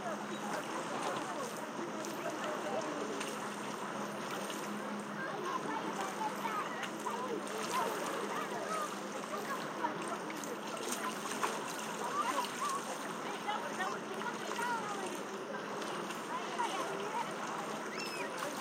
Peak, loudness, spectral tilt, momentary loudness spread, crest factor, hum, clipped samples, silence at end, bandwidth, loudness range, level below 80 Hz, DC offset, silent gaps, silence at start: -20 dBFS; -39 LUFS; -3 dB/octave; 4 LU; 18 dB; none; under 0.1%; 0 s; 16.5 kHz; 2 LU; -90 dBFS; under 0.1%; none; 0 s